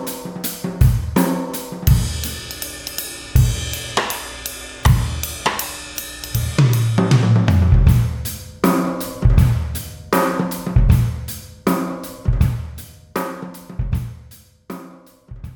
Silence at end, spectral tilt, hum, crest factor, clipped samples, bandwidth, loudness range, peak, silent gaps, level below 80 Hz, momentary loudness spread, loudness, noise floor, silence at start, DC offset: 0 s; -5.5 dB/octave; none; 18 dB; under 0.1%; 18 kHz; 7 LU; 0 dBFS; none; -24 dBFS; 14 LU; -19 LUFS; -44 dBFS; 0 s; under 0.1%